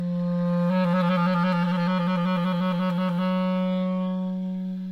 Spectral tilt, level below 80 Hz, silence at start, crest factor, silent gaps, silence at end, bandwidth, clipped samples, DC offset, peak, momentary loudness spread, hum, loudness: -9 dB/octave; -66 dBFS; 0 s; 12 dB; none; 0 s; 5.8 kHz; under 0.1%; under 0.1%; -12 dBFS; 6 LU; none; -25 LUFS